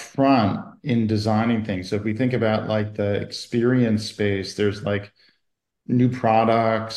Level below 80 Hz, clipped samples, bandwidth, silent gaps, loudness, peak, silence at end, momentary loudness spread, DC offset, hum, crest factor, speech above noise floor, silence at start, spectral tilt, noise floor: -60 dBFS; under 0.1%; 12 kHz; none; -22 LUFS; -6 dBFS; 0 s; 8 LU; under 0.1%; none; 16 dB; 56 dB; 0 s; -7 dB/octave; -77 dBFS